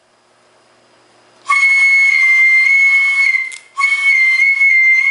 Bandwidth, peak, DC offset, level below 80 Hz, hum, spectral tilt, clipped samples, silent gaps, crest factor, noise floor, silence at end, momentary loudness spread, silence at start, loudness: 11.5 kHz; -2 dBFS; under 0.1%; -78 dBFS; none; 4 dB/octave; under 0.1%; none; 10 dB; -53 dBFS; 0 s; 7 LU; 1.45 s; -9 LUFS